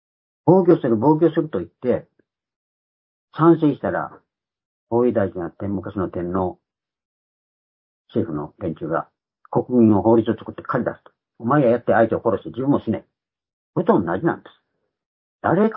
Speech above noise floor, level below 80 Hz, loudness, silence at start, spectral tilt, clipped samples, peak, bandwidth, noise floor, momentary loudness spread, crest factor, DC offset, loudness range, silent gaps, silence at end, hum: over 71 dB; -52 dBFS; -20 LUFS; 0.45 s; -13 dB/octave; under 0.1%; 0 dBFS; 4 kHz; under -90 dBFS; 12 LU; 20 dB; under 0.1%; 9 LU; 2.56-3.28 s, 4.65-4.87 s, 7.05-8.05 s, 13.53-13.73 s, 15.06-15.39 s; 0 s; none